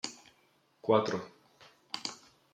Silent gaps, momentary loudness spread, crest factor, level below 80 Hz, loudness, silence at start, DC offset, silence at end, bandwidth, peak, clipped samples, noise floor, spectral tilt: none; 24 LU; 24 dB; -80 dBFS; -34 LUFS; 0.05 s; under 0.1%; 0.4 s; 11.5 kHz; -12 dBFS; under 0.1%; -69 dBFS; -4.5 dB/octave